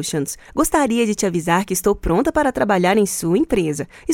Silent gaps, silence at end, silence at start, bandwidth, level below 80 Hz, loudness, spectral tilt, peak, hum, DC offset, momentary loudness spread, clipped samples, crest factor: none; 0 s; 0 s; 17 kHz; -38 dBFS; -18 LUFS; -4.5 dB/octave; -2 dBFS; none; under 0.1%; 7 LU; under 0.1%; 16 dB